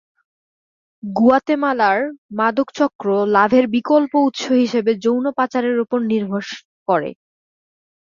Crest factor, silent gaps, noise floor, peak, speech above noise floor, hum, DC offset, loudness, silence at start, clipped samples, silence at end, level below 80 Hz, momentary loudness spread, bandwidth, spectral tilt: 16 dB; 2.18-2.29 s, 2.95-2.99 s, 6.65-6.86 s; under -90 dBFS; -2 dBFS; over 73 dB; none; under 0.1%; -18 LUFS; 1.05 s; under 0.1%; 1 s; -62 dBFS; 11 LU; 7.4 kHz; -6 dB/octave